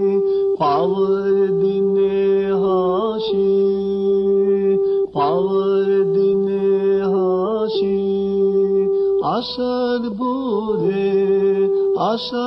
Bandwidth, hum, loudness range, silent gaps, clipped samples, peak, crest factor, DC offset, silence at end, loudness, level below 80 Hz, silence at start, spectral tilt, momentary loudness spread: 5.8 kHz; none; 2 LU; none; under 0.1%; -6 dBFS; 10 dB; under 0.1%; 0 s; -18 LUFS; -54 dBFS; 0 s; -8.5 dB/octave; 4 LU